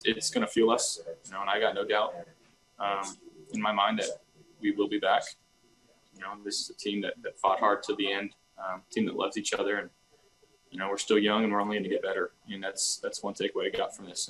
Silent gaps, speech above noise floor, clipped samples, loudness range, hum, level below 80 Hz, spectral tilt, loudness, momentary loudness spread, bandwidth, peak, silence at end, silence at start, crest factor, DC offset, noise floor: none; 34 dB; under 0.1%; 3 LU; none; -72 dBFS; -2.5 dB/octave; -30 LUFS; 14 LU; 12.5 kHz; -10 dBFS; 0 s; 0 s; 20 dB; under 0.1%; -64 dBFS